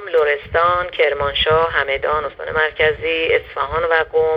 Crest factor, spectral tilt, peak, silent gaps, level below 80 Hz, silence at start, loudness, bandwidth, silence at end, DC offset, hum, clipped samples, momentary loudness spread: 16 dB; -6 dB/octave; -2 dBFS; none; -40 dBFS; 0 s; -17 LUFS; 5.4 kHz; 0 s; under 0.1%; none; under 0.1%; 5 LU